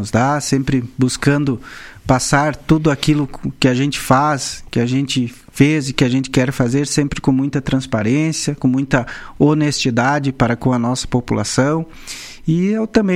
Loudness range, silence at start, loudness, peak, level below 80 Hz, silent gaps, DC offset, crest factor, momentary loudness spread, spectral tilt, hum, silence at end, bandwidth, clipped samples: 1 LU; 0 s; -17 LUFS; 0 dBFS; -38 dBFS; none; under 0.1%; 16 dB; 7 LU; -5.5 dB/octave; none; 0 s; 16 kHz; under 0.1%